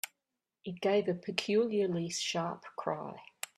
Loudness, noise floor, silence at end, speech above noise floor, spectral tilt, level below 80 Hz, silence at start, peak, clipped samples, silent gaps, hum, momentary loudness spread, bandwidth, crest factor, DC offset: -33 LUFS; -88 dBFS; 0.3 s; 55 dB; -4.5 dB/octave; -78 dBFS; 0.05 s; -12 dBFS; under 0.1%; none; none; 15 LU; 15 kHz; 22 dB; under 0.1%